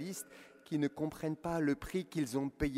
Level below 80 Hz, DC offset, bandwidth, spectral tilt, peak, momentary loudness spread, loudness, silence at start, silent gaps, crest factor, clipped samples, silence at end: -56 dBFS; under 0.1%; 16 kHz; -6 dB/octave; -20 dBFS; 10 LU; -37 LUFS; 0 s; none; 16 dB; under 0.1%; 0 s